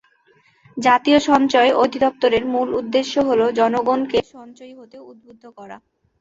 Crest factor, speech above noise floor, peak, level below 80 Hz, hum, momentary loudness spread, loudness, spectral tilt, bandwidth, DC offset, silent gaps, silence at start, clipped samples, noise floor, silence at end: 18 dB; 39 dB; -2 dBFS; -56 dBFS; none; 8 LU; -17 LUFS; -4 dB/octave; 8 kHz; under 0.1%; none; 0.75 s; under 0.1%; -57 dBFS; 0.45 s